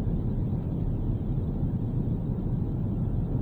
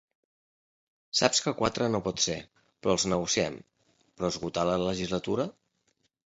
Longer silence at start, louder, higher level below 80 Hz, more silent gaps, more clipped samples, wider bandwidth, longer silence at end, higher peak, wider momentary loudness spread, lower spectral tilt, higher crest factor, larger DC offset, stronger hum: second, 0 s vs 1.15 s; about the same, -30 LUFS vs -29 LUFS; first, -34 dBFS vs -56 dBFS; neither; neither; second, 4 kHz vs 8.2 kHz; second, 0 s vs 0.8 s; second, -16 dBFS vs -6 dBFS; second, 1 LU vs 9 LU; first, -12 dB/octave vs -3.5 dB/octave; second, 12 dB vs 26 dB; neither; neither